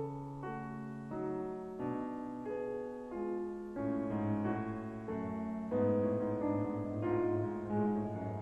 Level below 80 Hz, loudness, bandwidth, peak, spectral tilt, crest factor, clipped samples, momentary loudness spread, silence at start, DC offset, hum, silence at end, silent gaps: -62 dBFS; -38 LUFS; 8.2 kHz; -22 dBFS; -10 dB/octave; 14 dB; under 0.1%; 9 LU; 0 s; under 0.1%; none; 0 s; none